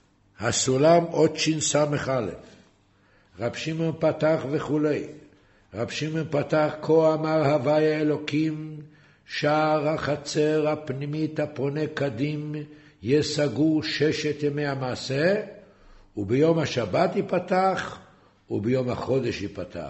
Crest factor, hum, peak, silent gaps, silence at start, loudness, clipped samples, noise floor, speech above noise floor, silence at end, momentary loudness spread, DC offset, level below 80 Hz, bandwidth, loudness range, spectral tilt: 18 dB; none; -6 dBFS; none; 0.4 s; -25 LUFS; under 0.1%; -61 dBFS; 36 dB; 0 s; 12 LU; under 0.1%; -58 dBFS; 8.2 kHz; 3 LU; -5 dB/octave